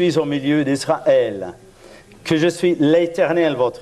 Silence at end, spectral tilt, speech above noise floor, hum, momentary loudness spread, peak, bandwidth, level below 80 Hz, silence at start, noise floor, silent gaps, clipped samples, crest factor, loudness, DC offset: 0 s; -6 dB/octave; 26 dB; none; 8 LU; -4 dBFS; 13 kHz; -56 dBFS; 0 s; -44 dBFS; none; under 0.1%; 14 dB; -18 LUFS; under 0.1%